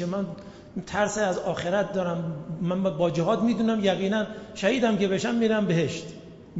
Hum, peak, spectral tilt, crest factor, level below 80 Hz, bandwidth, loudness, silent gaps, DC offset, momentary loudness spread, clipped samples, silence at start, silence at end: none; -10 dBFS; -6 dB/octave; 16 dB; -58 dBFS; 8 kHz; -26 LUFS; none; under 0.1%; 12 LU; under 0.1%; 0 s; 0 s